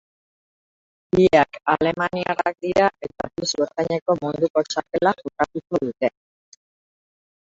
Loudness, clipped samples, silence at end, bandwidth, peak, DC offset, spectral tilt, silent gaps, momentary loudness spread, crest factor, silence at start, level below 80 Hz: -22 LUFS; under 0.1%; 1.45 s; 7.8 kHz; -2 dBFS; under 0.1%; -5 dB/octave; 4.02-4.06 s, 4.50-4.54 s; 8 LU; 20 dB; 1.15 s; -54 dBFS